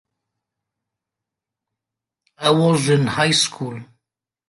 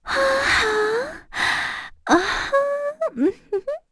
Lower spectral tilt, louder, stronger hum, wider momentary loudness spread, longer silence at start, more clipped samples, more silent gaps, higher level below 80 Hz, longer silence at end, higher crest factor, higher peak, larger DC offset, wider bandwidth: first, -4.5 dB/octave vs -3 dB/octave; first, -17 LUFS vs -21 LUFS; neither; first, 14 LU vs 10 LU; first, 2.4 s vs 0.05 s; neither; neither; second, -62 dBFS vs -46 dBFS; first, 0.65 s vs 0.15 s; about the same, 20 dB vs 18 dB; about the same, -4 dBFS vs -4 dBFS; neither; about the same, 11.5 kHz vs 11 kHz